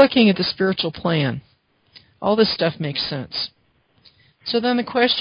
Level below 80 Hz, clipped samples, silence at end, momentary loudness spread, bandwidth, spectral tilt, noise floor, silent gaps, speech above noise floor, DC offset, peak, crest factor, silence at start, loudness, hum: -56 dBFS; under 0.1%; 0 s; 10 LU; 5.4 kHz; -10 dB/octave; -60 dBFS; none; 40 dB; under 0.1%; 0 dBFS; 20 dB; 0 s; -20 LUFS; none